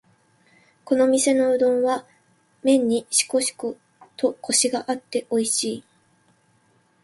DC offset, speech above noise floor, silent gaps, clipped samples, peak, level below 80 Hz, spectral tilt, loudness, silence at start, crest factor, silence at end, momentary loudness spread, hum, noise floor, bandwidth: under 0.1%; 41 dB; none; under 0.1%; -4 dBFS; -70 dBFS; -2 dB/octave; -22 LUFS; 0.85 s; 18 dB; 1.25 s; 10 LU; none; -62 dBFS; 12 kHz